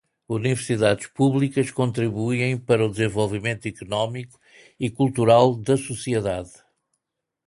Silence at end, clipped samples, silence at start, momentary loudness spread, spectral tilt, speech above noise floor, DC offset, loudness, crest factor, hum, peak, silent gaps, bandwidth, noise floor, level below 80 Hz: 1 s; under 0.1%; 0.3 s; 13 LU; -6 dB/octave; 59 dB; under 0.1%; -22 LUFS; 20 dB; none; -2 dBFS; none; 11.5 kHz; -82 dBFS; -54 dBFS